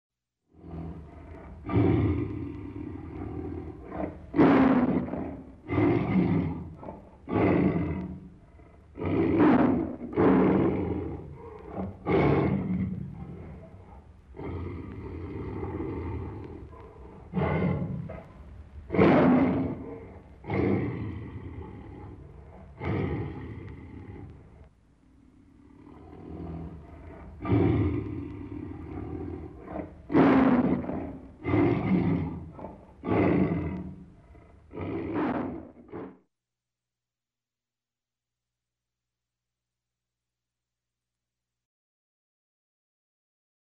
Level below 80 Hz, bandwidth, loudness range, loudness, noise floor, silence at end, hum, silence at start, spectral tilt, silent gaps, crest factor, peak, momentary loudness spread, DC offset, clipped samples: -48 dBFS; 5.6 kHz; 12 LU; -27 LUFS; under -90 dBFS; 7.5 s; 60 Hz at -55 dBFS; 0.6 s; -10.5 dB/octave; none; 22 dB; -8 dBFS; 23 LU; under 0.1%; under 0.1%